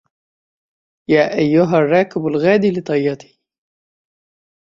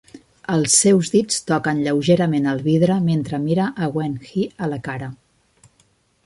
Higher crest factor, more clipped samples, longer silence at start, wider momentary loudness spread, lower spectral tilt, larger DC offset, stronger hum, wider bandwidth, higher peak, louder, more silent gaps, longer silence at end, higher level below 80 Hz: about the same, 18 dB vs 18 dB; neither; first, 1.1 s vs 0.15 s; second, 8 LU vs 12 LU; first, -7.5 dB/octave vs -5 dB/octave; neither; neither; second, 7.4 kHz vs 11.5 kHz; about the same, 0 dBFS vs -2 dBFS; first, -16 LUFS vs -19 LUFS; neither; first, 1.55 s vs 1.1 s; about the same, -60 dBFS vs -56 dBFS